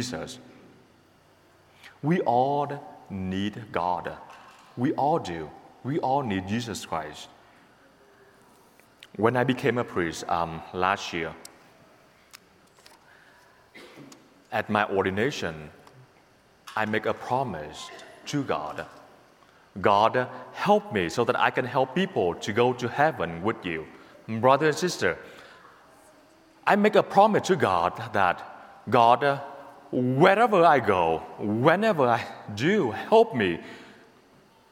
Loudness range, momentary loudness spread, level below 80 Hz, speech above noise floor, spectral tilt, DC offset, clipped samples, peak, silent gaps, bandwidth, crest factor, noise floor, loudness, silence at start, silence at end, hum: 10 LU; 19 LU; -62 dBFS; 34 dB; -5.5 dB/octave; under 0.1%; under 0.1%; -2 dBFS; none; 16.5 kHz; 24 dB; -59 dBFS; -25 LUFS; 0 s; 0.8 s; none